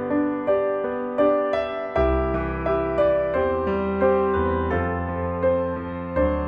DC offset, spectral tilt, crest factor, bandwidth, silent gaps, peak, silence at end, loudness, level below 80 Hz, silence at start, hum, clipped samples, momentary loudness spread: under 0.1%; -9.5 dB/octave; 14 dB; 5.8 kHz; none; -8 dBFS; 0 s; -23 LUFS; -36 dBFS; 0 s; none; under 0.1%; 6 LU